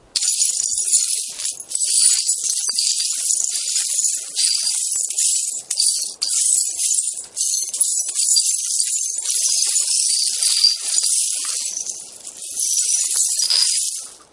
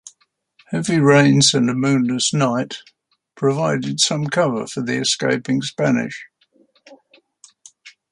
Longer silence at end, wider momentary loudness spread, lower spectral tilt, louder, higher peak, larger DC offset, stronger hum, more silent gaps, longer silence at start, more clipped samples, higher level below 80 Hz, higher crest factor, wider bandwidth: about the same, 0.15 s vs 0.2 s; second, 7 LU vs 12 LU; second, 5.5 dB/octave vs -4.5 dB/octave; about the same, -16 LUFS vs -18 LUFS; about the same, 0 dBFS vs -2 dBFS; neither; neither; neither; about the same, 0.15 s vs 0.05 s; neither; second, -72 dBFS vs -62 dBFS; about the same, 20 dB vs 18 dB; about the same, 12 kHz vs 11.5 kHz